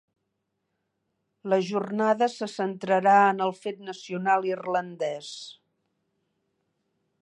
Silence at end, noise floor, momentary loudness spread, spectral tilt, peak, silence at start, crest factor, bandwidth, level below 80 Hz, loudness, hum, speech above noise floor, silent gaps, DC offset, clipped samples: 1.7 s; -79 dBFS; 18 LU; -5.5 dB/octave; -8 dBFS; 1.45 s; 20 dB; 10.5 kHz; -82 dBFS; -25 LUFS; none; 54 dB; none; under 0.1%; under 0.1%